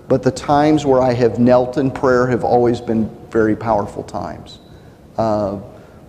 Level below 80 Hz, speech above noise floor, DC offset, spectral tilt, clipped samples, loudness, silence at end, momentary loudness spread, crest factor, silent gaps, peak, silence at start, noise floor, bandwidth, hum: -42 dBFS; 26 dB; under 0.1%; -7 dB/octave; under 0.1%; -16 LUFS; 0.3 s; 13 LU; 14 dB; none; -2 dBFS; 0.1 s; -41 dBFS; 10.5 kHz; none